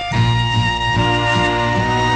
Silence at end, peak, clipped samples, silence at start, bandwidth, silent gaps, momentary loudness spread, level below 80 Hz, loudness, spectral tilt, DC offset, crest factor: 0 s; -4 dBFS; under 0.1%; 0 s; 9.4 kHz; none; 1 LU; -30 dBFS; -16 LUFS; -5.5 dB/octave; under 0.1%; 12 dB